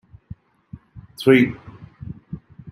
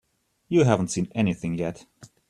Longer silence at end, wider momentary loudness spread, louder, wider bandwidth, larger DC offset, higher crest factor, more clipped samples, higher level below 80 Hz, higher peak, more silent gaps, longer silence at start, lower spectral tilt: second, 0 s vs 0.25 s; first, 27 LU vs 11 LU; first, -17 LUFS vs -24 LUFS; first, 15.5 kHz vs 12 kHz; neither; about the same, 22 dB vs 22 dB; neither; about the same, -52 dBFS vs -56 dBFS; about the same, -2 dBFS vs -4 dBFS; neither; first, 0.95 s vs 0.5 s; about the same, -7 dB/octave vs -6.5 dB/octave